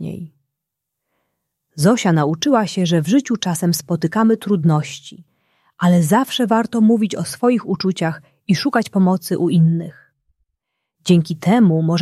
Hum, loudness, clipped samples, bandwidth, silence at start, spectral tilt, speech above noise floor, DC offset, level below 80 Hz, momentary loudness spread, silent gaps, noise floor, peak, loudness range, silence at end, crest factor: none; -17 LUFS; under 0.1%; 14 kHz; 0 s; -6 dB/octave; 64 dB; under 0.1%; -60 dBFS; 9 LU; none; -80 dBFS; -2 dBFS; 2 LU; 0 s; 16 dB